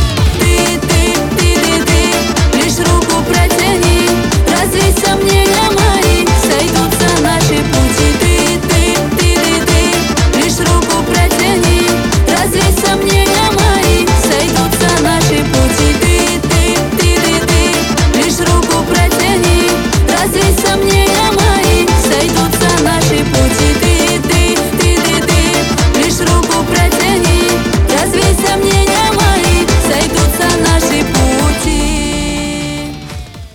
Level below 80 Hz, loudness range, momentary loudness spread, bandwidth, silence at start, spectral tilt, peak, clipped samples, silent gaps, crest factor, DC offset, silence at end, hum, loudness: -18 dBFS; 1 LU; 2 LU; 18.5 kHz; 0 s; -4 dB/octave; 0 dBFS; under 0.1%; none; 10 dB; 0.4%; 0.05 s; none; -10 LUFS